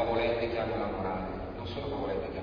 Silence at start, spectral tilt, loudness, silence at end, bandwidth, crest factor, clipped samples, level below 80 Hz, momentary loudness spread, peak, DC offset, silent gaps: 0 s; -4.5 dB/octave; -33 LUFS; 0 s; 5.4 kHz; 14 dB; under 0.1%; -46 dBFS; 9 LU; -18 dBFS; under 0.1%; none